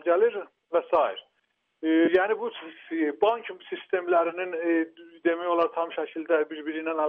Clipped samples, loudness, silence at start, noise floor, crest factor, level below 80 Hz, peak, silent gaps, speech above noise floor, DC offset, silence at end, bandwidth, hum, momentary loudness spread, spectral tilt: under 0.1%; -27 LUFS; 0.05 s; -74 dBFS; 16 dB; -74 dBFS; -10 dBFS; none; 48 dB; under 0.1%; 0 s; 4.2 kHz; none; 12 LU; -7 dB/octave